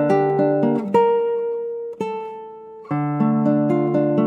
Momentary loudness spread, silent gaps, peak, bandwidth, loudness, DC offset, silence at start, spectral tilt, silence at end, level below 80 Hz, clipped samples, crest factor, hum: 13 LU; none; -4 dBFS; 8.8 kHz; -20 LUFS; under 0.1%; 0 s; -9.5 dB/octave; 0 s; -72 dBFS; under 0.1%; 14 dB; none